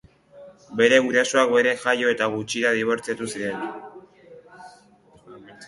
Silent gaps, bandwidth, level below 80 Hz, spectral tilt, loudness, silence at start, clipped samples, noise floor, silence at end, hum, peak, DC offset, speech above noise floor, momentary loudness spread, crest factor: none; 11.5 kHz; -66 dBFS; -3 dB/octave; -21 LUFS; 0.35 s; under 0.1%; -54 dBFS; 0 s; none; -2 dBFS; under 0.1%; 33 dB; 14 LU; 20 dB